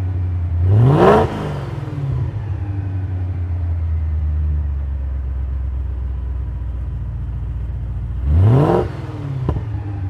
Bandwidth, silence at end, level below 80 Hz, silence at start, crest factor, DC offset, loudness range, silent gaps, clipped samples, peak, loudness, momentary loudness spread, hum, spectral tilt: 6.2 kHz; 0 s; -24 dBFS; 0 s; 18 dB; under 0.1%; 7 LU; none; under 0.1%; 0 dBFS; -20 LUFS; 13 LU; none; -9.5 dB/octave